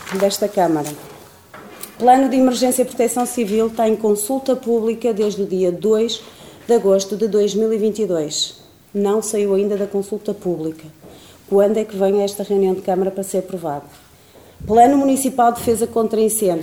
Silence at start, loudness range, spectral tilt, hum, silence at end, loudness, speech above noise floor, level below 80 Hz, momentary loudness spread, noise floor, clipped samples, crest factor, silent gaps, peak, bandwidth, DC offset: 0 s; 3 LU; -4.5 dB/octave; none; 0 s; -18 LUFS; 29 dB; -54 dBFS; 11 LU; -46 dBFS; under 0.1%; 18 dB; none; 0 dBFS; 18.5 kHz; 0.1%